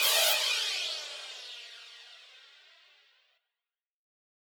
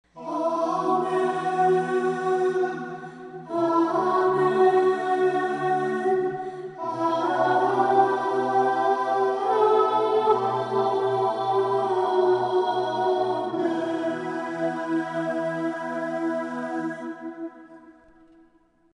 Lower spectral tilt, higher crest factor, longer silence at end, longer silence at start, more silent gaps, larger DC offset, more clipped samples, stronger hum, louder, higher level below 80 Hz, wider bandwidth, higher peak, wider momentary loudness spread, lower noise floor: second, 5.5 dB/octave vs -6.5 dB/octave; first, 24 dB vs 16 dB; first, 2.1 s vs 1.05 s; second, 0 s vs 0.15 s; neither; neither; neither; neither; second, -28 LUFS vs -24 LUFS; second, under -90 dBFS vs -74 dBFS; first, over 20 kHz vs 10 kHz; second, -12 dBFS vs -8 dBFS; first, 25 LU vs 10 LU; first, under -90 dBFS vs -60 dBFS